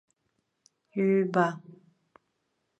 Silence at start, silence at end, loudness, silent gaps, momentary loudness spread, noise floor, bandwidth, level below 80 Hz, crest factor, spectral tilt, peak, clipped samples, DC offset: 0.95 s; 1.05 s; -27 LUFS; none; 14 LU; -78 dBFS; 8.2 kHz; -80 dBFS; 22 dB; -8 dB/octave; -10 dBFS; under 0.1%; under 0.1%